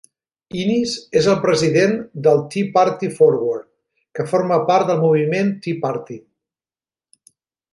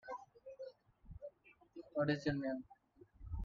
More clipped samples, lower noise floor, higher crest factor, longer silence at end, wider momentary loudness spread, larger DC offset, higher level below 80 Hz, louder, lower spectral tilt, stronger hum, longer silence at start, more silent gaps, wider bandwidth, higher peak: neither; first, under -90 dBFS vs -63 dBFS; about the same, 16 dB vs 20 dB; first, 1.55 s vs 0 s; second, 13 LU vs 22 LU; neither; about the same, -60 dBFS vs -60 dBFS; first, -18 LUFS vs -42 LUFS; about the same, -6 dB/octave vs -6 dB/octave; neither; first, 0.55 s vs 0.05 s; neither; first, 11.5 kHz vs 7.2 kHz; first, -2 dBFS vs -24 dBFS